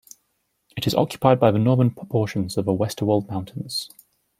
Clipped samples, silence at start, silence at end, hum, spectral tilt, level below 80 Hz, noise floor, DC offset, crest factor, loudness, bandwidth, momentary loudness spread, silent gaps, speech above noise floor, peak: under 0.1%; 0.75 s; 0.5 s; none; -6.5 dB/octave; -56 dBFS; -72 dBFS; under 0.1%; 20 dB; -22 LUFS; 16 kHz; 12 LU; none; 51 dB; -2 dBFS